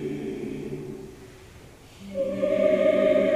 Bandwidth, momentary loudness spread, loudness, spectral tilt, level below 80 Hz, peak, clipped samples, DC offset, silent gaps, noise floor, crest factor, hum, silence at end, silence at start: 12.5 kHz; 24 LU; -25 LUFS; -7 dB/octave; -54 dBFS; -8 dBFS; under 0.1%; under 0.1%; none; -48 dBFS; 16 dB; none; 0 s; 0 s